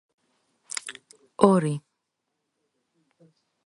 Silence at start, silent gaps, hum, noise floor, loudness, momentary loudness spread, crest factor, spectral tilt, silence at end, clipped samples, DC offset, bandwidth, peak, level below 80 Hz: 0.7 s; none; none; -80 dBFS; -24 LUFS; 20 LU; 28 dB; -6 dB/octave; 1.85 s; under 0.1%; under 0.1%; 11.5 kHz; 0 dBFS; -64 dBFS